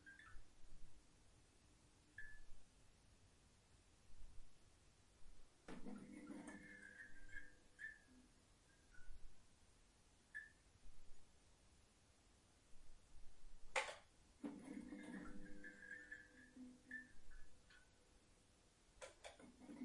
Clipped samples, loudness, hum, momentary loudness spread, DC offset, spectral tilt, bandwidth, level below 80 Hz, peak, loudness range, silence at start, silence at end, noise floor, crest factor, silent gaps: under 0.1%; -56 LUFS; none; 15 LU; under 0.1%; -3.5 dB/octave; 11 kHz; -68 dBFS; -28 dBFS; 14 LU; 0 s; 0 s; -74 dBFS; 28 dB; none